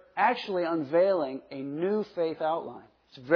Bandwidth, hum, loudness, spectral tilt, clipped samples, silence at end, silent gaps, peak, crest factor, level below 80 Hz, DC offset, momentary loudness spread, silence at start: 5.4 kHz; none; -29 LUFS; -7.5 dB/octave; under 0.1%; 0 s; none; -10 dBFS; 18 dB; -76 dBFS; under 0.1%; 13 LU; 0.15 s